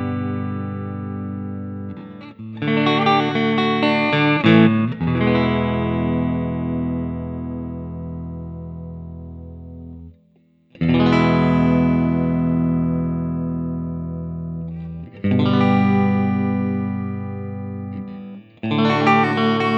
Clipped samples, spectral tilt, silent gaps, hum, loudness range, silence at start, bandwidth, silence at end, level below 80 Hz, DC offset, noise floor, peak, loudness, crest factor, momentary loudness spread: under 0.1%; -8.5 dB/octave; none; none; 10 LU; 0 s; 7.2 kHz; 0 s; -42 dBFS; under 0.1%; -57 dBFS; -2 dBFS; -20 LUFS; 18 dB; 17 LU